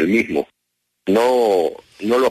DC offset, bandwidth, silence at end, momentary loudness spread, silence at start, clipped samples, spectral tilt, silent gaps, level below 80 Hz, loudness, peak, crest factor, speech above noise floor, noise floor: under 0.1%; 13.5 kHz; 0 s; 13 LU; 0 s; under 0.1%; -5.5 dB/octave; none; -58 dBFS; -18 LUFS; -4 dBFS; 14 dB; 57 dB; -74 dBFS